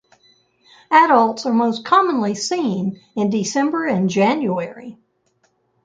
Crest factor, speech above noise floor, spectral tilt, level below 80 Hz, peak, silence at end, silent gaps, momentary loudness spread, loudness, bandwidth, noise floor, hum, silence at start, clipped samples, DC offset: 18 dB; 47 dB; -5 dB/octave; -66 dBFS; -2 dBFS; 0.9 s; none; 11 LU; -18 LUFS; 9.4 kHz; -64 dBFS; none; 0.9 s; under 0.1%; under 0.1%